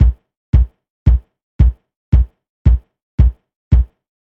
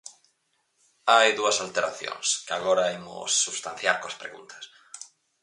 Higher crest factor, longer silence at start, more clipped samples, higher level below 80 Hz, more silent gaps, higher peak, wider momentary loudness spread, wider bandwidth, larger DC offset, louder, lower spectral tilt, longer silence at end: second, 14 dB vs 22 dB; about the same, 0 s vs 0.05 s; neither; first, -16 dBFS vs -72 dBFS; first, 0.37-0.53 s, 0.90-1.06 s, 1.43-1.59 s, 1.96-2.12 s, 2.49-2.65 s, 3.03-3.18 s, 3.56-3.71 s vs none; about the same, -2 dBFS vs -4 dBFS; second, 7 LU vs 23 LU; second, 3.3 kHz vs 11.5 kHz; first, 0.1% vs under 0.1%; first, -17 LUFS vs -24 LUFS; first, -10.5 dB/octave vs 0 dB/octave; about the same, 0.35 s vs 0.35 s